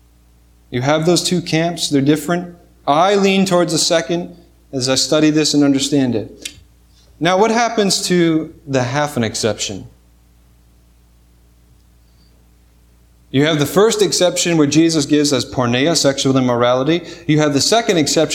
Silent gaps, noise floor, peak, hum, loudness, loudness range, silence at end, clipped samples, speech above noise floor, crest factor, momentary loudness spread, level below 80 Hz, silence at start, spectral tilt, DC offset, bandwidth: none; -50 dBFS; 0 dBFS; none; -15 LUFS; 8 LU; 0 s; under 0.1%; 35 dB; 16 dB; 9 LU; -50 dBFS; 0.7 s; -4 dB/octave; under 0.1%; 17.5 kHz